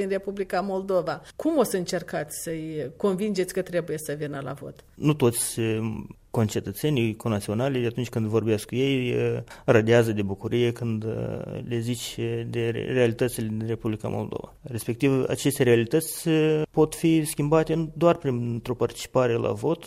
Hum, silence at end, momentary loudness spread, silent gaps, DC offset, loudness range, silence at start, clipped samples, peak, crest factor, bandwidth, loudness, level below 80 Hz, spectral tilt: none; 0 s; 10 LU; none; under 0.1%; 5 LU; 0 s; under 0.1%; -6 dBFS; 18 dB; 16 kHz; -26 LUFS; -54 dBFS; -6 dB/octave